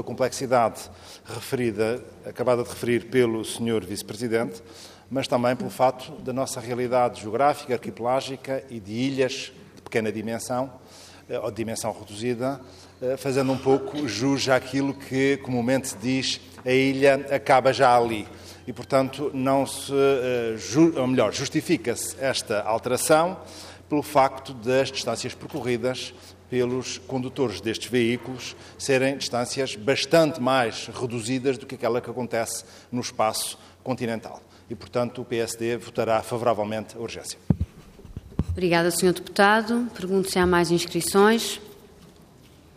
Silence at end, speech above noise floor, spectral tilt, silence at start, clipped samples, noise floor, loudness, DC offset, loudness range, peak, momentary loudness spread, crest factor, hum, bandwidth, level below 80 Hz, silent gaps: 0.7 s; 27 dB; -4.5 dB/octave; 0 s; under 0.1%; -51 dBFS; -25 LUFS; under 0.1%; 7 LU; -6 dBFS; 13 LU; 20 dB; none; 15.5 kHz; -54 dBFS; none